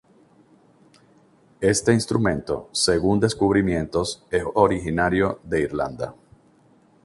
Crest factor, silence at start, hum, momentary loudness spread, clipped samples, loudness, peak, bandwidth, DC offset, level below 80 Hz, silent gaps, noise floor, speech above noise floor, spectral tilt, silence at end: 20 dB; 1.6 s; none; 7 LU; under 0.1%; -22 LUFS; -2 dBFS; 11.5 kHz; under 0.1%; -44 dBFS; none; -57 dBFS; 35 dB; -5 dB/octave; 0.9 s